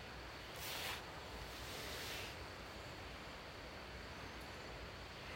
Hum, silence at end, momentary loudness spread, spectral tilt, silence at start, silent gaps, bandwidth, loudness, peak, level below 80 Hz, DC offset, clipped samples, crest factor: none; 0 s; 6 LU; -3 dB/octave; 0 s; none; 16 kHz; -49 LUFS; -32 dBFS; -60 dBFS; under 0.1%; under 0.1%; 18 dB